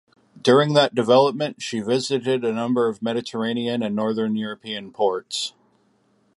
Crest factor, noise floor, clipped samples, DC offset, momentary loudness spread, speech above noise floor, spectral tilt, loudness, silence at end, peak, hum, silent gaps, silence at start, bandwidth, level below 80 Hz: 20 dB; -63 dBFS; under 0.1%; under 0.1%; 11 LU; 42 dB; -5 dB/octave; -22 LUFS; 0.9 s; -2 dBFS; none; none; 0.35 s; 11.5 kHz; -70 dBFS